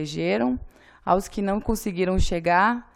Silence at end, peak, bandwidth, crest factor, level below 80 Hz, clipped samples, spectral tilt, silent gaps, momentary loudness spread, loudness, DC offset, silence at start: 0.1 s; -6 dBFS; 17 kHz; 18 dB; -34 dBFS; under 0.1%; -5.5 dB/octave; none; 7 LU; -24 LUFS; under 0.1%; 0 s